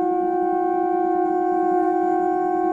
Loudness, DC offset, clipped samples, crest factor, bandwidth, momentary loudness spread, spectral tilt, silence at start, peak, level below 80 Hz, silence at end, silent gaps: -21 LUFS; under 0.1%; under 0.1%; 10 dB; 7.4 kHz; 1 LU; -8 dB/octave; 0 s; -10 dBFS; -60 dBFS; 0 s; none